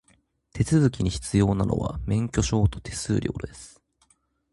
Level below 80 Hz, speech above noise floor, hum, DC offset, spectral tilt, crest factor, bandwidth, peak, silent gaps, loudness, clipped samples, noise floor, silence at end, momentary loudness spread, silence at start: -38 dBFS; 42 dB; none; under 0.1%; -6.5 dB/octave; 18 dB; 11.5 kHz; -8 dBFS; none; -25 LUFS; under 0.1%; -66 dBFS; 0.85 s; 13 LU; 0.55 s